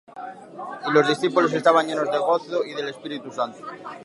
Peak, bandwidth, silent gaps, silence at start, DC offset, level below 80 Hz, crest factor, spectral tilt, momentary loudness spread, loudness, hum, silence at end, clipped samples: -2 dBFS; 11.5 kHz; none; 0.15 s; under 0.1%; -76 dBFS; 20 dB; -5 dB/octave; 18 LU; -22 LUFS; none; 0 s; under 0.1%